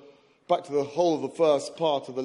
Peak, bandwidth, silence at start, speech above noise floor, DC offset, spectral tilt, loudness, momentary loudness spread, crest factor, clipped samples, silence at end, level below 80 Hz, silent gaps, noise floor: -10 dBFS; 11.5 kHz; 0.5 s; 28 dB; under 0.1%; -5 dB/octave; -26 LUFS; 5 LU; 18 dB; under 0.1%; 0 s; -78 dBFS; none; -53 dBFS